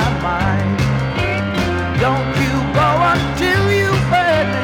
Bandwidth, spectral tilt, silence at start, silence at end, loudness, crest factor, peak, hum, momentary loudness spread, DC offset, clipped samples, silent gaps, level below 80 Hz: 17.5 kHz; -6 dB/octave; 0 s; 0 s; -16 LUFS; 12 dB; -4 dBFS; none; 4 LU; under 0.1%; under 0.1%; none; -32 dBFS